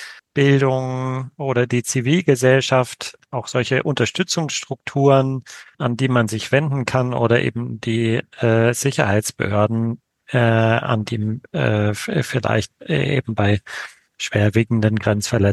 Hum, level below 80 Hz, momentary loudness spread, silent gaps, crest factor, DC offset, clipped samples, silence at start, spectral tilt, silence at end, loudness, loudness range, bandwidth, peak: none; -54 dBFS; 10 LU; none; 18 dB; under 0.1%; under 0.1%; 0 s; -5.5 dB/octave; 0 s; -19 LUFS; 2 LU; 12.5 kHz; -2 dBFS